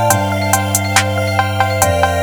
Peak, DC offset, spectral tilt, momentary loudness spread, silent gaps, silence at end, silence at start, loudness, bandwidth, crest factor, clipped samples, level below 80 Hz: 0 dBFS; under 0.1%; -3.5 dB/octave; 2 LU; none; 0 s; 0 s; -14 LUFS; over 20 kHz; 14 dB; under 0.1%; -38 dBFS